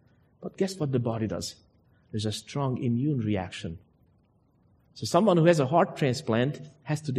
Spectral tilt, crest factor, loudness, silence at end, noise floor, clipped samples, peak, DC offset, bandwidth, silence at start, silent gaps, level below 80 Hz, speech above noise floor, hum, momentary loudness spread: -6.5 dB/octave; 20 dB; -27 LUFS; 0 s; -65 dBFS; under 0.1%; -8 dBFS; under 0.1%; 13 kHz; 0.4 s; none; -62 dBFS; 38 dB; none; 17 LU